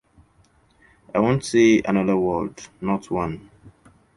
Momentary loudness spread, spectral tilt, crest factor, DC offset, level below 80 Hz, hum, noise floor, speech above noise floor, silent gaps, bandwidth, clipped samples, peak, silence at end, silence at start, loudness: 14 LU; -6 dB/octave; 18 dB; under 0.1%; -50 dBFS; none; -59 dBFS; 38 dB; none; 11.5 kHz; under 0.1%; -4 dBFS; 0.45 s; 1.15 s; -21 LUFS